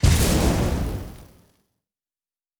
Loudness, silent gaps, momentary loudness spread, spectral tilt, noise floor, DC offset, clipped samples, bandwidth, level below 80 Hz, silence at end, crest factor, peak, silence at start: -22 LUFS; none; 16 LU; -5 dB/octave; under -90 dBFS; under 0.1%; under 0.1%; over 20 kHz; -28 dBFS; 1.35 s; 18 dB; -6 dBFS; 0 s